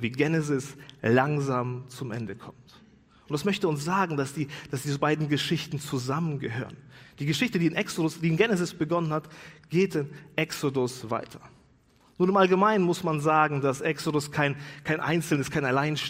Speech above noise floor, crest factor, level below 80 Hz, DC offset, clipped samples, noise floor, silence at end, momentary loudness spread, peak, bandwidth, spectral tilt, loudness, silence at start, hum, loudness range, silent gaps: 34 dB; 20 dB; -64 dBFS; under 0.1%; under 0.1%; -61 dBFS; 0 s; 12 LU; -6 dBFS; 16 kHz; -5.5 dB/octave; -27 LUFS; 0 s; none; 5 LU; none